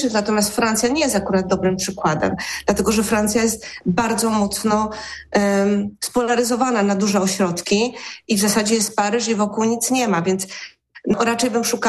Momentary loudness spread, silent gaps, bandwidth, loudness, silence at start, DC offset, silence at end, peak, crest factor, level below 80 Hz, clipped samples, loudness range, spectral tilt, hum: 5 LU; none; 13 kHz; -19 LUFS; 0 s; under 0.1%; 0 s; -6 dBFS; 14 dB; -46 dBFS; under 0.1%; 1 LU; -4 dB/octave; none